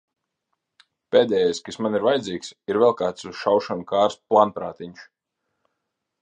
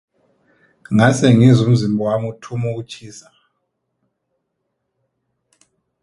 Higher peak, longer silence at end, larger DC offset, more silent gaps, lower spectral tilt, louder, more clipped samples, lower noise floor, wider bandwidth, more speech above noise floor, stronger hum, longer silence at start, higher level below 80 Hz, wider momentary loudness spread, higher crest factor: about the same, -2 dBFS vs 0 dBFS; second, 1.2 s vs 2.8 s; neither; neither; second, -5 dB/octave vs -7 dB/octave; second, -22 LUFS vs -15 LUFS; neither; first, -80 dBFS vs -74 dBFS; second, 9.6 kHz vs 11.5 kHz; about the same, 58 dB vs 59 dB; neither; first, 1.1 s vs 0.9 s; second, -64 dBFS vs -52 dBFS; second, 13 LU vs 17 LU; about the same, 22 dB vs 18 dB